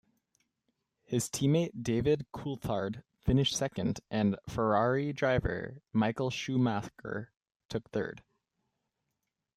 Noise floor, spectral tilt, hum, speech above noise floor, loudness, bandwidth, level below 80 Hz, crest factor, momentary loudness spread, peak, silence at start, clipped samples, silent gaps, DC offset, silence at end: -85 dBFS; -5.5 dB/octave; none; 54 dB; -32 LUFS; 15 kHz; -52 dBFS; 18 dB; 12 LU; -14 dBFS; 1.1 s; under 0.1%; 7.56-7.69 s; under 0.1%; 1.35 s